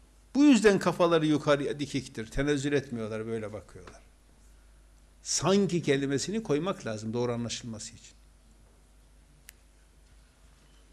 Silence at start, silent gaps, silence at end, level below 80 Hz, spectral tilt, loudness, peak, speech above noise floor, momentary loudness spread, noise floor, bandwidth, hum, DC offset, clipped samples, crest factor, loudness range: 0.35 s; none; 2.85 s; -52 dBFS; -5 dB/octave; -28 LUFS; -12 dBFS; 30 dB; 16 LU; -59 dBFS; 13 kHz; none; under 0.1%; under 0.1%; 18 dB; 12 LU